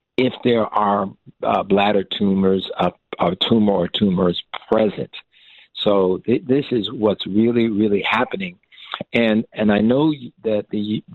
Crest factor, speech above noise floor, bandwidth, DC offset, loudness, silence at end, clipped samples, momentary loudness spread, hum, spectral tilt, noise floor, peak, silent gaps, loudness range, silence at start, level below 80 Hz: 16 dB; 31 dB; 4.4 kHz; under 0.1%; -19 LUFS; 0 s; under 0.1%; 9 LU; none; -8.5 dB/octave; -50 dBFS; -4 dBFS; none; 1 LU; 0.2 s; -54 dBFS